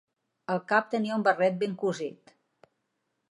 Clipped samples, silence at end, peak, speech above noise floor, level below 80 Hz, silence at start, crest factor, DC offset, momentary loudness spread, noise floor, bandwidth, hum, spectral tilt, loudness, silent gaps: under 0.1%; 1.2 s; -10 dBFS; 52 dB; -82 dBFS; 0.5 s; 20 dB; under 0.1%; 12 LU; -79 dBFS; 11 kHz; none; -6 dB/octave; -28 LUFS; none